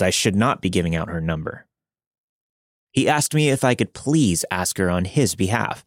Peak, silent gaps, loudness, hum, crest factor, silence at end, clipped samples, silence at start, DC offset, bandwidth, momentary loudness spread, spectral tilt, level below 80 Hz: -4 dBFS; 2.07-2.11 s, 2.18-2.87 s; -21 LUFS; none; 18 dB; 0.05 s; under 0.1%; 0 s; under 0.1%; 16.5 kHz; 7 LU; -4.5 dB/octave; -50 dBFS